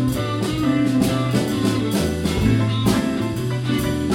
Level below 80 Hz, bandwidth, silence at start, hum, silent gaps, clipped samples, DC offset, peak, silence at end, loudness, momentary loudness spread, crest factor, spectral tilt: -36 dBFS; 17 kHz; 0 s; none; none; under 0.1%; under 0.1%; -6 dBFS; 0 s; -20 LUFS; 4 LU; 14 dB; -6 dB/octave